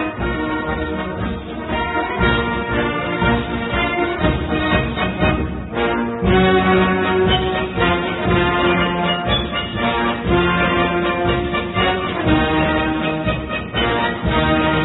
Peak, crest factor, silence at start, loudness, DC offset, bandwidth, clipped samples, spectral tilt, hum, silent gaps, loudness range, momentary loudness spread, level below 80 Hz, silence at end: -2 dBFS; 16 dB; 0 s; -18 LUFS; under 0.1%; 4.1 kHz; under 0.1%; -11.5 dB/octave; none; none; 3 LU; 7 LU; -30 dBFS; 0 s